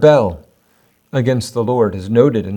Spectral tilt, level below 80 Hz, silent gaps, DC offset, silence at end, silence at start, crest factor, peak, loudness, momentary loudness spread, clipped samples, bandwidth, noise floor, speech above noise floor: -7 dB/octave; -50 dBFS; none; under 0.1%; 0 s; 0 s; 16 dB; 0 dBFS; -16 LUFS; 9 LU; under 0.1%; 17.5 kHz; -57 dBFS; 43 dB